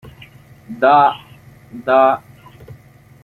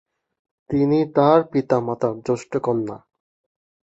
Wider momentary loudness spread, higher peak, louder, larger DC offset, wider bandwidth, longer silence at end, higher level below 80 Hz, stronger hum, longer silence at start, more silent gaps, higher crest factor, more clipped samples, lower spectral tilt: first, 22 LU vs 10 LU; about the same, -2 dBFS vs -2 dBFS; first, -14 LUFS vs -20 LUFS; neither; first, 12 kHz vs 8 kHz; second, 0.5 s vs 1 s; about the same, -56 dBFS vs -56 dBFS; neither; about the same, 0.7 s vs 0.7 s; neither; about the same, 16 dB vs 20 dB; neither; second, -6.5 dB/octave vs -8 dB/octave